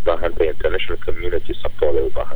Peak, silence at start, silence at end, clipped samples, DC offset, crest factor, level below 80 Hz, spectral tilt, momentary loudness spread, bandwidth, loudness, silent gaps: -4 dBFS; 0 s; 0 s; under 0.1%; under 0.1%; 10 dB; -28 dBFS; -7 dB/octave; 6 LU; over 20 kHz; -22 LUFS; none